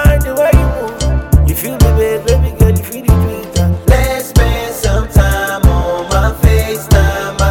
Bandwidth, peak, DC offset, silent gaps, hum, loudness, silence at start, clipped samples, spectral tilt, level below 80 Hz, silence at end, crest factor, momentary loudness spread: 17.5 kHz; 0 dBFS; 0.2%; none; none; -13 LUFS; 0 s; 0.2%; -6 dB/octave; -14 dBFS; 0 s; 10 dB; 5 LU